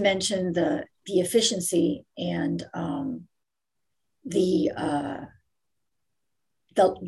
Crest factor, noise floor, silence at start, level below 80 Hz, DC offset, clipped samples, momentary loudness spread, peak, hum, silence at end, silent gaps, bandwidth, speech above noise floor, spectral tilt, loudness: 18 dB; -84 dBFS; 0 s; -60 dBFS; under 0.1%; under 0.1%; 12 LU; -10 dBFS; none; 0 s; none; 13 kHz; 59 dB; -4.5 dB/octave; -26 LUFS